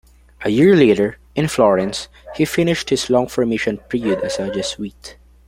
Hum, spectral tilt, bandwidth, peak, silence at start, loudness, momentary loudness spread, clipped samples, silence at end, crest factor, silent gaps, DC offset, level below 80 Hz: none; -5.5 dB/octave; 16 kHz; 0 dBFS; 0.4 s; -17 LUFS; 13 LU; under 0.1%; 0.35 s; 16 dB; none; under 0.1%; -46 dBFS